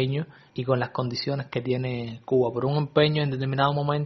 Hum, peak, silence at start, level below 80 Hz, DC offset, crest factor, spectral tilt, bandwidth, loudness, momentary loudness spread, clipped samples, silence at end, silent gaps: none; -6 dBFS; 0 s; -60 dBFS; under 0.1%; 20 dB; -5.5 dB/octave; 6.2 kHz; -26 LUFS; 9 LU; under 0.1%; 0 s; none